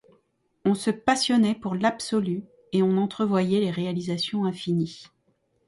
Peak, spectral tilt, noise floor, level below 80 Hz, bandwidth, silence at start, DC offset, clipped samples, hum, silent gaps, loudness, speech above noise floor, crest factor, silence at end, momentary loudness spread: -8 dBFS; -5.5 dB/octave; -69 dBFS; -64 dBFS; 11.5 kHz; 0.65 s; under 0.1%; under 0.1%; none; none; -25 LUFS; 45 dB; 18 dB; 0.6 s; 7 LU